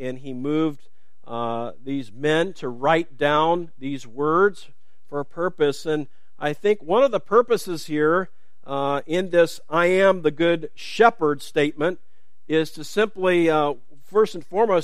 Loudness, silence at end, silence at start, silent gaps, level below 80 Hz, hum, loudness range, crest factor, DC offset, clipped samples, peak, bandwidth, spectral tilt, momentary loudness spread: -22 LUFS; 0 s; 0 s; none; -66 dBFS; none; 3 LU; 20 dB; 2%; under 0.1%; -2 dBFS; 15 kHz; -5.5 dB/octave; 12 LU